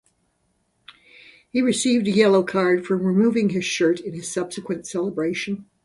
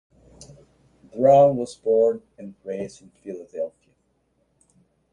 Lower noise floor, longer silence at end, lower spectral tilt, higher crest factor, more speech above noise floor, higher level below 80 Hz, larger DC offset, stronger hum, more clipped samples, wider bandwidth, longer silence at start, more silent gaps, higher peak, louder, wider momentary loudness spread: about the same, -69 dBFS vs -68 dBFS; second, 0.2 s vs 1.45 s; second, -5 dB/octave vs -7.5 dB/octave; about the same, 18 dB vs 20 dB; about the same, 48 dB vs 47 dB; about the same, -64 dBFS vs -62 dBFS; neither; neither; neither; about the same, 11.5 kHz vs 10.5 kHz; first, 1.55 s vs 1.15 s; neither; about the same, -4 dBFS vs -4 dBFS; about the same, -21 LUFS vs -21 LUFS; second, 11 LU vs 24 LU